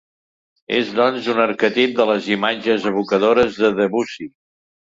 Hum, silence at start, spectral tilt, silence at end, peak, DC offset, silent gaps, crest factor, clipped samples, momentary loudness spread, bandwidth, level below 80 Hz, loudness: none; 0.7 s; -5.5 dB/octave; 0.7 s; -2 dBFS; under 0.1%; none; 16 dB; under 0.1%; 7 LU; 7.8 kHz; -56 dBFS; -18 LUFS